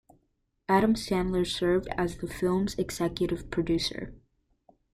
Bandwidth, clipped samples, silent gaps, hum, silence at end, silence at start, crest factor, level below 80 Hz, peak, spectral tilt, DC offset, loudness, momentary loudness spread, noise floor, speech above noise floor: 15 kHz; under 0.1%; none; none; 0.75 s; 0.7 s; 20 dB; -48 dBFS; -10 dBFS; -5.5 dB/octave; under 0.1%; -28 LUFS; 8 LU; -75 dBFS; 47 dB